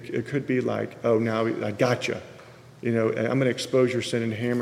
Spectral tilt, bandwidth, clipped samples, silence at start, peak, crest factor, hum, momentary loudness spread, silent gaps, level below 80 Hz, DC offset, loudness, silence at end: -6 dB/octave; 15 kHz; under 0.1%; 0 s; -8 dBFS; 16 dB; none; 6 LU; none; -66 dBFS; under 0.1%; -25 LUFS; 0 s